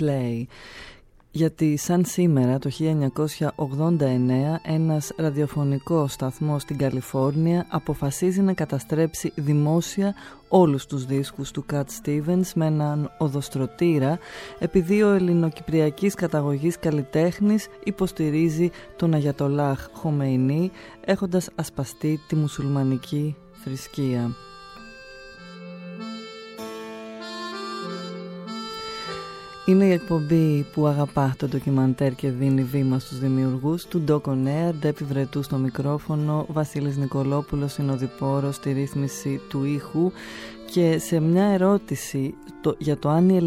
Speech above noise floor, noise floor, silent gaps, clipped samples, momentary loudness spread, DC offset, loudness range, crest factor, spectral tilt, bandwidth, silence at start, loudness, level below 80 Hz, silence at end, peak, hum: 20 dB; -43 dBFS; none; under 0.1%; 14 LU; under 0.1%; 7 LU; 18 dB; -7 dB/octave; 16 kHz; 0 s; -24 LUFS; -52 dBFS; 0 s; -4 dBFS; none